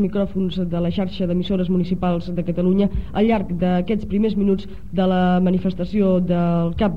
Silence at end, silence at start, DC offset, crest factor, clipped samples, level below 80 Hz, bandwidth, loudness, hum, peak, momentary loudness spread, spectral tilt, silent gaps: 0 s; 0 s; 2%; 12 dB; under 0.1%; -36 dBFS; 5.2 kHz; -20 LUFS; none; -8 dBFS; 5 LU; -9.5 dB/octave; none